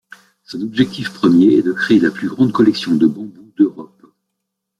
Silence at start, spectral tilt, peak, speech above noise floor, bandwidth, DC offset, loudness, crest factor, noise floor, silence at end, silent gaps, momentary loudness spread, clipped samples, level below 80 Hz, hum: 0.5 s; -7 dB/octave; -2 dBFS; 62 dB; 11.5 kHz; under 0.1%; -15 LUFS; 14 dB; -76 dBFS; 0.95 s; none; 14 LU; under 0.1%; -56 dBFS; none